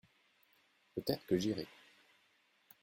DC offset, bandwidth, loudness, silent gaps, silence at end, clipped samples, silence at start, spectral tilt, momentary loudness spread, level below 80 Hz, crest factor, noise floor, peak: under 0.1%; 16.5 kHz; -39 LUFS; none; 1.15 s; under 0.1%; 0.95 s; -6 dB/octave; 12 LU; -72 dBFS; 24 dB; -74 dBFS; -18 dBFS